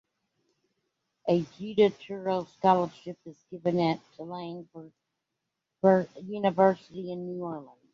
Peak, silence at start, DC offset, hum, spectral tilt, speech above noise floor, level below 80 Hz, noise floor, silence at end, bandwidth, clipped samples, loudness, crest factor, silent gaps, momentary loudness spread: -8 dBFS; 1.25 s; under 0.1%; none; -8 dB/octave; 56 dB; -72 dBFS; -84 dBFS; 0.3 s; 7.2 kHz; under 0.1%; -28 LUFS; 22 dB; none; 19 LU